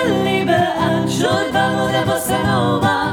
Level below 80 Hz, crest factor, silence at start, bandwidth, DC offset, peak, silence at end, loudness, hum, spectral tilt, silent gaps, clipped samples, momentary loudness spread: -46 dBFS; 14 dB; 0 s; over 20 kHz; under 0.1%; -2 dBFS; 0 s; -17 LUFS; none; -5 dB/octave; none; under 0.1%; 2 LU